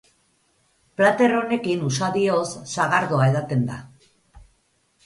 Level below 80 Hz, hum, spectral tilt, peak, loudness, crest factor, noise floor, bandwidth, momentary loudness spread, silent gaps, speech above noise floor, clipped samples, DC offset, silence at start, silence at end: -58 dBFS; none; -5.5 dB/octave; -4 dBFS; -21 LUFS; 18 dB; -65 dBFS; 11.5 kHz; 10 LU; none; 45 dB; under 0.1%; under 0.1%; 1 s; 0.65 s